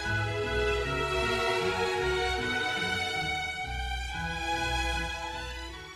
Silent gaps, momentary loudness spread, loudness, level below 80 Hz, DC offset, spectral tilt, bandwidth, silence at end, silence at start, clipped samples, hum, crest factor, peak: none; 6 LU; -30 LUFS; -40 dBFS; under 0.1%; -4 dB/octave; 13.5 kHz; 0 s; 0 s; under 0.1%; none; 14 dB; -16 dBFS